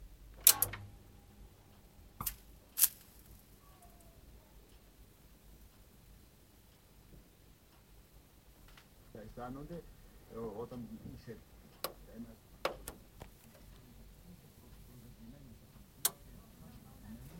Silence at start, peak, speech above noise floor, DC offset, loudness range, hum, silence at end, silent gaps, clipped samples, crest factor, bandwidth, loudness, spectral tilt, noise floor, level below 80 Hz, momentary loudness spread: 0 s; -6 dBFS; 16 dB; under 0.1%; 23 LU; none; 0 s; none; under 0.1%; 36 dB; 16.5 kHz; -34 LUFS; -1.5 dB/octave; -63 dBFS; -60 dBFS; 29 LU